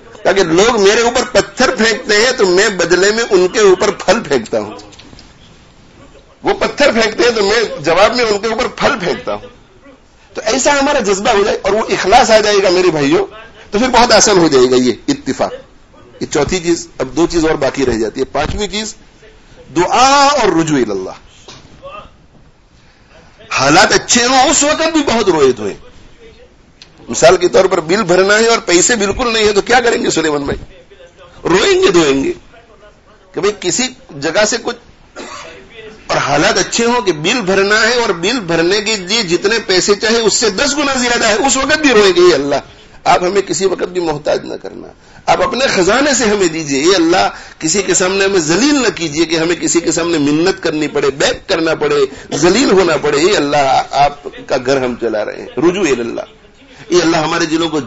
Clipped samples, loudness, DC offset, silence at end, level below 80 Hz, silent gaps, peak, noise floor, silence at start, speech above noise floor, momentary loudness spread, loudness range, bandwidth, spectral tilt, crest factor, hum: 0.1%; -12 LUFS; under 0.1%; 0 s; -38 dBFS; none; 0 dBFS; -45 dBFS; 0.1 s; 33 dB; 11 LU; 5 LU; 11 kHz; -3 dB/octave; 12 dB; none